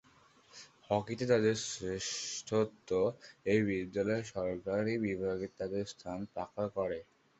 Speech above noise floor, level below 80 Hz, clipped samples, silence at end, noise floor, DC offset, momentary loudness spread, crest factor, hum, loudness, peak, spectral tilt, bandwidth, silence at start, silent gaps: 30 dB; -64 dBFS; under 0.1%; 0.35 s; -64 dBFS; under 0.1%; 10 LU; 20 dB; none; -35 LUFS; -16 dBFS; -5 dB/octave; 8.2 kHz; 0.55 s; none